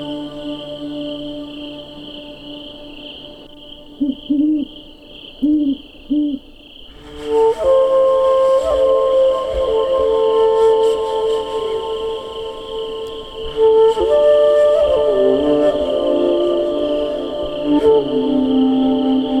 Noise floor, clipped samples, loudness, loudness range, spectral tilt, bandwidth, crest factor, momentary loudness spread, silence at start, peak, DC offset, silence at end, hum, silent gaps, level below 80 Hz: -39 dBFS; under 0.1%; -16 LUFS; 10 LU; -6 dB/octave; 10.5 kHz; 14 dB; 19 LU; 0 s; -2 dBFS; under 0.1%; 0 s; none; none; -42 dBFS